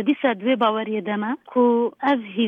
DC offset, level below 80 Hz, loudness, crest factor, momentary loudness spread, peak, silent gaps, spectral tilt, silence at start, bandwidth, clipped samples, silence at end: under 0.1%; -74 dBFS; -21 LUFS; 14 dB; 6 LU; -8 dBFS; none; -8 dB/octave; 0 s; 4.8 kHz; under 0.1%; 0 s